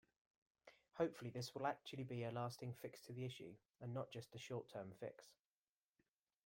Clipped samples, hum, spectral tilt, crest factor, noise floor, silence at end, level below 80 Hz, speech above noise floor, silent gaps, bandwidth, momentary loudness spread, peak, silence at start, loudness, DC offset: under 0.1%; none; -6 dB/octave; 22 dB; under -90 dBFS; 1.1 s; -84 dBFS; over 41 dB; none; 16.5 kHz; 15 LU; -28 dBFS; 0.65 s; -50 LUFS; under 0.1%